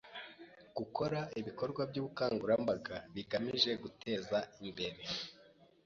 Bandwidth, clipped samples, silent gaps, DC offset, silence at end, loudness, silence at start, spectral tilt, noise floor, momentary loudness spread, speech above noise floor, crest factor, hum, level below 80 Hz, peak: 7.4 kHz; under 0.1%; none; under 0.1%; 0.35 s; -38 LUFS; 0.05 s; -3.5 dB/octave; -64 dBFS; 14 LU; 26 dB; 22 dB; none; -70 dBFS; -16 dBFS